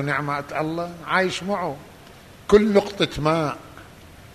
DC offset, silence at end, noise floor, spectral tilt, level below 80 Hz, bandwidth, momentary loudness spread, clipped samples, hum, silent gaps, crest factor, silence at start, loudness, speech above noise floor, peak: under 0.1%; 0 s; -45 dBFS; -5.5 dB/octave; -48 dBFS; 13.5 kHz; 18 LU; under 0.1%; none; none; 20 dB; 0 s; -22 LUFS; 24 dB; -4 dBFS